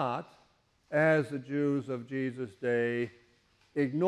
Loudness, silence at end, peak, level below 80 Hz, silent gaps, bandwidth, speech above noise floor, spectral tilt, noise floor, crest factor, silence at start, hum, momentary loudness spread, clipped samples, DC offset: -32 LUFS; 0 s; -16 dBFS; -72 dBFS; none; 11.5 kHz; 38 dB; -8 dB/octave; -68 dBFS; 16 dB; 0 s; none; 10 LU; under 0.1%; under 0.1%